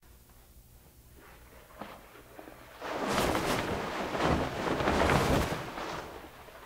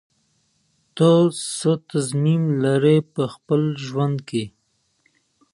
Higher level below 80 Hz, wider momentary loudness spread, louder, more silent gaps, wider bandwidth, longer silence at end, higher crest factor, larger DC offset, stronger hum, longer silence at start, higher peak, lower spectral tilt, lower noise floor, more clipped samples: first, -46 dBFS vs -66 dBFS; first, 23 LU vs 11 LU; second, -31 LUFS vs -20 LUFS; neither; first, 16 kHz vs 11.5 kHz; second, 0 s vs 1.05 s; first, 26 dB vs 18 dB; neither; first, 60 Hz at -60 dBFS vs none; second, 0.15 s vs 0.95 s; second, -8 dBFS vs -4 dBFS; second, -5 dB/octave vs -6.5 dB/octave; second, -56 dBFS vs -68 dBFS; neither